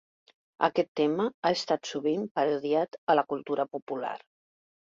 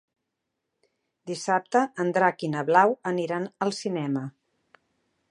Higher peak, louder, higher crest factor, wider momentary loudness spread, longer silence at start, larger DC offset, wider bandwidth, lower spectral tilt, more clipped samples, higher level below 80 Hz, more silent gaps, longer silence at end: second, -8 dBFS vs -4 dBFS; second, -29 LUFS vs -25 LUFS; about the same, 22 dB vs 22 dB; second, 8 LU vs 12 LU; second, 0.6 s vs 1.25 s; neither; second, 7.8 kHz vs 11 kHz; about the same, -5 dB/octave vs -5.5 dB/octave; neither; about the same, -76 dBFS vs -78 dBFS; first, 0.88-0.95 s, 1.34-1.43 s, 2.31-2.35 s, 2.98-3.07 s, 3.82-3.87 s vs none; second, 0.75 s vs 1 s